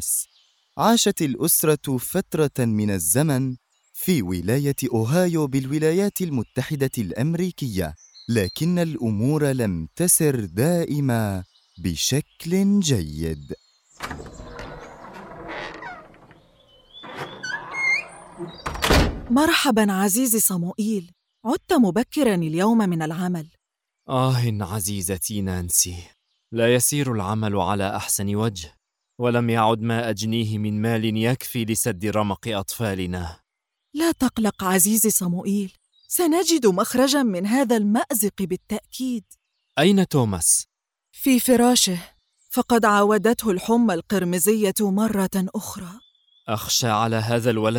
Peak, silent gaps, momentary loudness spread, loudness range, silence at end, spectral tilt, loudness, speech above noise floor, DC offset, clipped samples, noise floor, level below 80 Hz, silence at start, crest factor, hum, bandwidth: -4 dBFS; none; 16 LU; 5 LU; 0 s; -4.5 dB/octave; -21 LUFS; 59 dB; under 0.1%; under 0.1%; -81 dBFS; -44 dBFS; 0 s; 18 dB; none; over 20 kHz